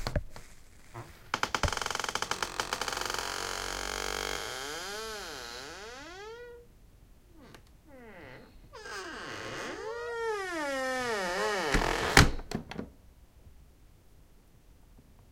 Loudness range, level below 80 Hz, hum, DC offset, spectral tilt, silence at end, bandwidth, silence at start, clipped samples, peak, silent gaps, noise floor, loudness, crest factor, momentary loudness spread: 17 LU; -44 dBFS; none; under 0.1%; -3 dB/octave; 0 s; 17 kHz; 0 s; under 0.1%; -2 dBFS; none; -58 dBFS; -32 LUFS; 34 dB; 20 LU